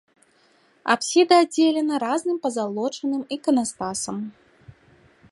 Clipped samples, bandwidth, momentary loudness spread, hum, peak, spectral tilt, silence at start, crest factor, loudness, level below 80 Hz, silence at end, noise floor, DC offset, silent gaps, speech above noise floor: under 0.1%; 11.5 kHz; 12 LU; none; -4 dBFS; -3.5 dB/octave; 0.85 s; 20 dB; -22 LUFS; -66 dBFS; 0.6 s; -60 dBFS; under 0.1%; none; 38 dB